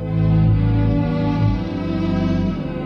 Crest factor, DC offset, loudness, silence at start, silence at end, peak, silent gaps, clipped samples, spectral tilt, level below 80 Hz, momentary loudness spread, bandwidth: 12 dB; under 0.1%; -19 LUFS; 0 s; 0 s; -6 dBFS; none; under 0.1%; -10 dB/octave; -28 dBFS; 6 LU; 6 kHz